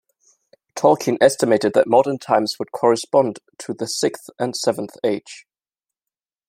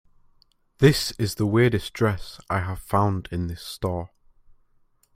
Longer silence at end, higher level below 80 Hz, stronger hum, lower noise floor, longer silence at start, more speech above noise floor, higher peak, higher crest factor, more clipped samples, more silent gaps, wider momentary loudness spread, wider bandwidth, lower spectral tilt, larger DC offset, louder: about the same, 1.1 s vs 1.1 s; second, -68 dBFS vs -46 dBFS; neither; first, -89 dBFS vs -62 dBFS; about the same, 0.75 s vs 0.8 s; first, 70 dB vs 39 dB; about the same, -2 dBFS vs -2 dBFS; about the same, 18 dB vs 22 dB; neither; neither; about the same, 13 LU vs 12 LU; about the same, 16 kHz vs 16 kHz; second, -4 dB/octave vs -6 dB/octave; neither; first, -19 LUFS vs -24 LUFS